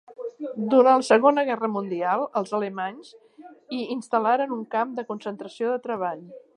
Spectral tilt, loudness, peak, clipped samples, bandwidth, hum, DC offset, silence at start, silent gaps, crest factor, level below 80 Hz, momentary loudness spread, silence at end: -5.5 dB/octave; -24 LUFS; -4 dBFS; under 0.1%; 11 kHz; none; under 0.1%; 0.1 s; none; 20 dB; -80 dBFS; 16 LU; 0.2 s